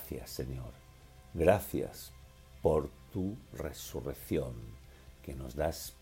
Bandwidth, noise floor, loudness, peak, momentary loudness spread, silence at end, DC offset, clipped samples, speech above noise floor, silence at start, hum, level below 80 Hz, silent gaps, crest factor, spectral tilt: 16 kHz; -56 dBFS; -36 LUFS; -12 dBFS; 20 LU; 0.05 s; under 0.1%; under 0.1%; 21 dB; 0 s; none; -50 dBFS; none; 26 dB; -6 dB/octave